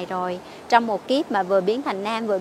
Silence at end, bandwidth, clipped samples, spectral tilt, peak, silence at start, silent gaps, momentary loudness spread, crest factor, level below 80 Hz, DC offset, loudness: 0 s; 14 kHz; under 0.1%; -5 dB/octave; -2 dBFS; 0 s; none; 8 LU; 22 dB; -66 dBFS; under 0.1%; -23 LUFS